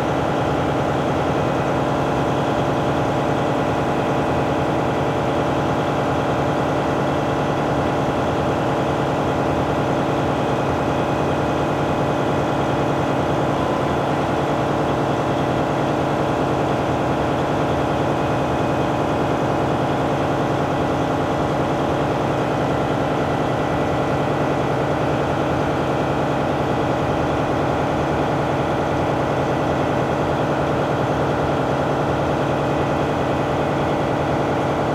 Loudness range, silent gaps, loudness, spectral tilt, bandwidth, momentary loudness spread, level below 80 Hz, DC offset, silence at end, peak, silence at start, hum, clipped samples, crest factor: 0 LU; none; -20 LUFS; -7 dB/octave; 15 kHz; 0 LU; -40 dBFS; under 0.1%; 0 s; -8 dBFS; 0 s; none; under 0.1%; 12 dB